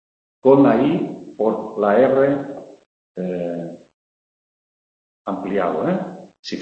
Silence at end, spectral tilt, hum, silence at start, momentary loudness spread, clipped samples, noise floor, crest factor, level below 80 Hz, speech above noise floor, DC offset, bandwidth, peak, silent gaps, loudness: 0 s; -8 dB/octave; none; 0.45 s; 20 LU; under 0.1%; under -90 dBFS; 20 dB; -60 dBFS; over 73 dB; under 0.1%; 7.6 kHz; -2 dBFS; 2.86-3.15 s, 3.94-5.25 s, 6.39-6.43 s; -19 LUFS